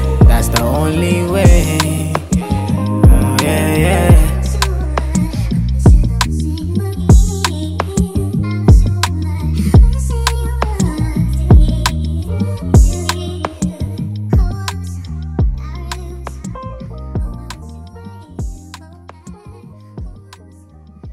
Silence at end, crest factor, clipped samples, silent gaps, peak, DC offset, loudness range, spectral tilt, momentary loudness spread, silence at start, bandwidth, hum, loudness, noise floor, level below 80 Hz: 0 s; 14 dB; under 0.1%; none; 0 dBFS; under 0.1%; 15 LU; -6 dB/octave; 18 LU; 0 s; 16 kHz; none; -15 LUFS; -40 dBFS; -16 dBFS